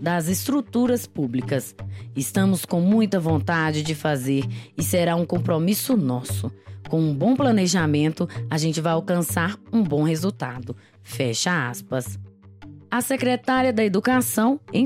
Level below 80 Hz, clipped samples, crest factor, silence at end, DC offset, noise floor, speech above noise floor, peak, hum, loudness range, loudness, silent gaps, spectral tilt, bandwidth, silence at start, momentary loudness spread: -58 dBFS; under 0.1%; 16 dB; 0 s; under 0.1%; -44 dBFS; 22 dB; -6 dBFS; none; 3 LU; -22 LUFS; none; -5.5 dB/octave; 16.5 kHz; 0 s; 10 LU